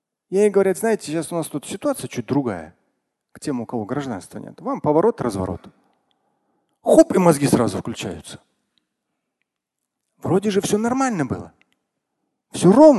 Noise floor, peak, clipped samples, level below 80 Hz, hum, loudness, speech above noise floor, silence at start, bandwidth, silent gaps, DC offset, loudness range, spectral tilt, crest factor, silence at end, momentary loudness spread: -81 dBFS; 0 dBFS; under 0.1%; -52 dBFS; none; -20 LUFS; 63 dB; 0.3 s; 12.5 kHz; none; under 0.1%; 7 LU; -6 dB/octave; 20 dB; 0 s; 17 LU